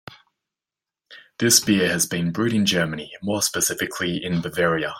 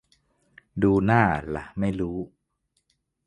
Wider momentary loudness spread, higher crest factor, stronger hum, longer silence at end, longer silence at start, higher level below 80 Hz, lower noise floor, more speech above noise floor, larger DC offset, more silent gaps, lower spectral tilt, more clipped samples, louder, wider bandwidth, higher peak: second, 9 LU vs 16 LU; about the same, 20 dB vs 22 dB; neither; second, 0 s vs 1 s; second, 0.1 s vs 0.75 s; second, -58 dBFS vs -46 dBFS; first, -89 dBFS vs -75 dBFS; first, 68 dB vs 51 dB; neither; neither; second, -3 dB/octave vs -9 dB/octave; neither; first, -21 LUFS vs -24 LUFS; first, 16.5 kHz vs 9.6 kHz; about the same, -2 dBFS vs -4 dBFS